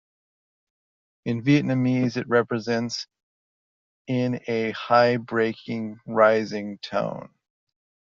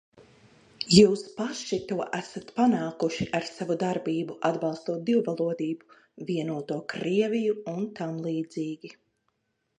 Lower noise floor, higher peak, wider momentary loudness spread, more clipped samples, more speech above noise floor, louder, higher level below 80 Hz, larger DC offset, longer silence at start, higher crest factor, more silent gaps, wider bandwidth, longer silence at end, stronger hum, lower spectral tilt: first, under -90 dBFS vs -76 dBFS; second, -6 dBFS vs -2 dBFS; about the same, 13 LU vs 12 LU; neither; first, over 67 dB vs 49 dB; first, -24 LUFS vs -27 LUFS; about the same, -68 dBFS vs -64 dBFS; neither; first, 1.25 s vs 0.8 s; second, 20 dB vs 26 dB; first, 3.23-4.05 s vs none; second, 7.4 kHz vs 11 kHz; about the same, 0.9 s vs 0.85 s; neither; about the same, -5 dB/octave vs -5.5 dB/octave